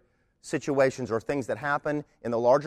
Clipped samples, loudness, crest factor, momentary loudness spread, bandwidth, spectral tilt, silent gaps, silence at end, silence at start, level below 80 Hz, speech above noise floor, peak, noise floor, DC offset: under 0.1%; -28 LUFS; 18 dB; 8 LU; 13 kHz; -6 dB/octave; none; 0 s; 0.45 s; -62 dBFS; 25 dB; -10 dBFS; -52 dBFS; under 0.1%